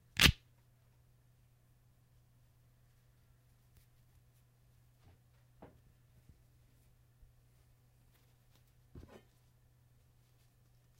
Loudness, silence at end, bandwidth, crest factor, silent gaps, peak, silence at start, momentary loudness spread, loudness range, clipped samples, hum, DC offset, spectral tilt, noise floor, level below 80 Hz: -28 LUFS; 10.65 s; 16 kHz; 36 dB; none; -8 dBFS; 0.2 s; 34 LU; 5 LU; under 0.1%; none; under 0.1%; -2.5 dB/octave; -68 dBFS; -54 dBFS